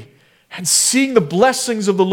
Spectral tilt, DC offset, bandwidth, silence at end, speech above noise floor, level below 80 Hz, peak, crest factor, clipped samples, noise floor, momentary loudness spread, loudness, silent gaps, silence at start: -3 dB/octave; under 0.1%; 19.5 kHz; 0 s; 33 dB; -62 dBFS; 0 dBFS; 16 dB; under 0.1%; -48 dBFS; 9 LU; -15 LUFS; none; 0 s